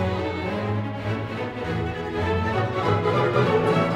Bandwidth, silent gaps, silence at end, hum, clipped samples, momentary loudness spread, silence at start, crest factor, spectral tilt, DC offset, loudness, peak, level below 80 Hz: 11 kHz; none; 0 s; none; under 0.1%; 8 LU; 0 s; 16 dB; -7.5 dB/octave; under 0.1%; -24 LUFS; -8 dBFS; -44 dBFS